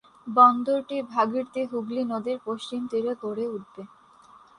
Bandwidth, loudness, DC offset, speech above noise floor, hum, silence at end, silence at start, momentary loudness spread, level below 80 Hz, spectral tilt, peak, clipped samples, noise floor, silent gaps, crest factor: 10.5 kHz; -25 LUFS; under 0.1%; 28 dB; none; 0.75 s; 0.25 s; 14 LU; -74 dBFS; -6 dB/octave; -4 dBFS; under 0.1%; -53 dBFS; none; 22 dB